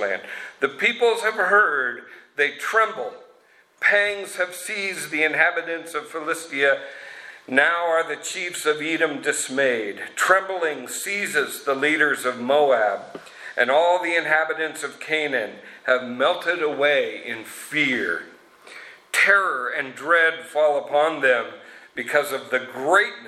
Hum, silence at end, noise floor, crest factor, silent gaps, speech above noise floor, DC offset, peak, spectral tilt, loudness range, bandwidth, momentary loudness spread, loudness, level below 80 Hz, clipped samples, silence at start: none; 0 s; -56 dBFS; 22 dB; none; 34 dB; under 0.1%; -2 dBFS; -2 dB/octave; 3 LU; 15.5 kHz; 13 LU; -21 LUFS; -76 dBFS; under 0.1%; 0 s